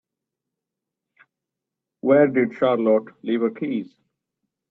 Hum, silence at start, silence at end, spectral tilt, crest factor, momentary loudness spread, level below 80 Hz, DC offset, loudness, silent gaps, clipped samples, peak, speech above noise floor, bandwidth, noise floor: none; 2.05 s; 0.85 s; -9.5 dB/octave; 20 dB; 11 LU; -70 dBFS; under 0.1%; -21 LUFS; none; under 0.1%; -4 dBFS; 65 dB; 4.2 kHz; -85 dBFS